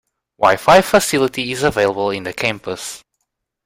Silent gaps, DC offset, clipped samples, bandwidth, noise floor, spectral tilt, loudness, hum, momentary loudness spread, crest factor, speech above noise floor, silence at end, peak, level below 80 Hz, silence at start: none; under 0.1%; under 0.1%; 16 kHz; -74 dBFS; -3.5 dB/octave; -16 LUFS; none; 15 LU; 16 dB; 59 dB; 0.7 s; 0 dBFS; -46 dBFS; 0.4 s